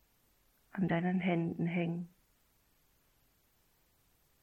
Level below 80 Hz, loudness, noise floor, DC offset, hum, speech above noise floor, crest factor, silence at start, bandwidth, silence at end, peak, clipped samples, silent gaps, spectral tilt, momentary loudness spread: -72 dBFS; -35 LUFS; -72 dBFS; under 0.1%; none; 39 dB; 18 dB; 0.75 s; 14 kHz; 2.35 s; -20 dBFS; under 0.1%; none; -9 dB/octave; 12 LU